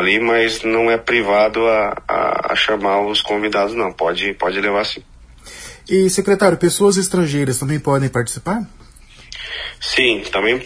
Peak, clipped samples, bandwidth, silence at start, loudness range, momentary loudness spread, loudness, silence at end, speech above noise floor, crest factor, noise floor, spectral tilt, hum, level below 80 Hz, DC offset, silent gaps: 0 dBFS; under 0.1%; 11 kHz; 0 s; 3 LU; 12 LU; -16 LUFS; 0 s; 25 dB; 18 dB; -42 dBFS; -4 dB/octave; none; -44 dBFS; under 0.1%; none